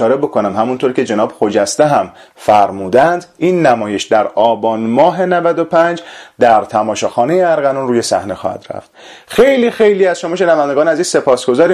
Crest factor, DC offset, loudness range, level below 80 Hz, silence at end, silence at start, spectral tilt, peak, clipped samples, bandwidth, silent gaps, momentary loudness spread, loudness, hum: 12 dB; under 0.1%; 2 LU; -52 dBFS; 0 s; 0 s; -5 dB/octave; 0 dBFS; under 0.1%; 13.5 kHz; none; 6 LU; -13 LUFS; none